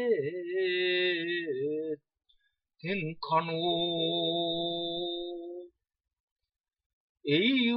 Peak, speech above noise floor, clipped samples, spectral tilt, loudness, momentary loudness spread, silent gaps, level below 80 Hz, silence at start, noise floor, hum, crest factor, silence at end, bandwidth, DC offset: -14 dBFS; 42 dB; under 0.1%; -9 dB/octave; -30 LUFS; 13 LU; 6.20-6.36 s, 6.86-7.15 s; -70 dBFS; 0 s; -72 dBFS; none; 18 dB; 0 s; 5.6 kHz; under 0.1%